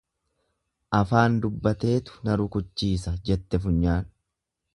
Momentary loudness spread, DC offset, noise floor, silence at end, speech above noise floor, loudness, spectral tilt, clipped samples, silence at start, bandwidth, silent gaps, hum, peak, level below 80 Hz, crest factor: 7 LU; under 0.1%; -82 dBFS; 0.7 s; 58 dB; -25 LUFS; -7.5 dB/octave; under 0.1%; 0.9 s; 11.5 kHz; none; none; -4 dBFS; -38 dBFS; 22 dB